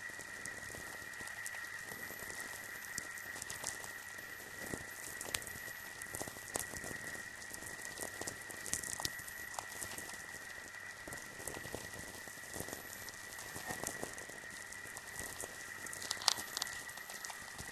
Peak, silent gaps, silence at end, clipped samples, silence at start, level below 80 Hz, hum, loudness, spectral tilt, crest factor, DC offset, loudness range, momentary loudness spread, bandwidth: -8 dBFS; none; 0 s; under 0.1%; 0 s; -66 dBFS; none; -43 LUFS; -1 dB/octave; 38 dB; under 0.1%; 5 LU; 6 LU; 14 kHz